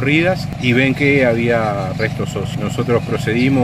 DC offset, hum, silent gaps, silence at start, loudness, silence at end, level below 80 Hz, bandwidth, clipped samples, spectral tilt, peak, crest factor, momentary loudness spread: under 0.1%; 50 Hz at -30 dBFS; none; 0 s; -16 LUFS; 0 s; -40 dBFS; 15 kHz; under 0.1%; -6.5 dB/octave; 0 dBFS; 16 dB; 8 LU